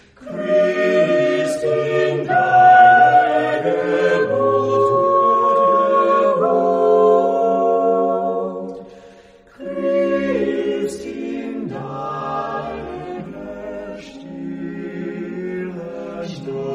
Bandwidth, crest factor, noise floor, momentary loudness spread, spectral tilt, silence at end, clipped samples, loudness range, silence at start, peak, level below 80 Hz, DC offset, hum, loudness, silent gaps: 10.5 kHz; 16 dB; -46 dBFS; 17 LU; -6 dB/octave; 0 s; under 0.1%; 15 LU; 0.2 s; 0 dBFS; -54 dBFS; under 0.1%; none; -16 LUFS; none